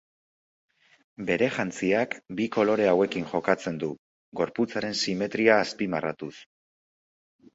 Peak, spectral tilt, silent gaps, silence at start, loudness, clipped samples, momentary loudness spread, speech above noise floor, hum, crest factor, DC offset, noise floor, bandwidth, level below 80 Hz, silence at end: -4 dBFS; -5 dB/octave; 3.98-4.32 s; 1.2 s; -26 LUFS; under 0.1%; 12 LU; over 64 dB; none; 22 dB; under 0.1%; under -90 dBFS; 8 kHz; -66 dBFS; 1.1 s